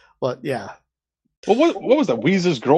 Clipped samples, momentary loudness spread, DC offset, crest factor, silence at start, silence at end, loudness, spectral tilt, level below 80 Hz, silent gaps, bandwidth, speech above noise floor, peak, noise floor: under 0.1%; 12 LU; under 0.1%; 18 dB; 0.2 s; 0 s; -20 LUFS; -6.5 dB/octave; -64 dBFS; 1.37-1.43 s; 11.5 kHz; 57 dB; -2 dBFS; -76 dBFS